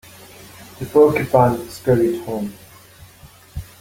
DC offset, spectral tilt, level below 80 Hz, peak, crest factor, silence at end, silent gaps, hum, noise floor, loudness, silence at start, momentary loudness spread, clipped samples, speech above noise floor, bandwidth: under 0.1%; -7 dB/octave; -46 dBFS; -2 dBFS; 18 dB; 0.2 s; none; none; -45 dBFS; -17 LUFS; 0.4 s; 23 LU; under 0.1%; 29 dB; 17 kHz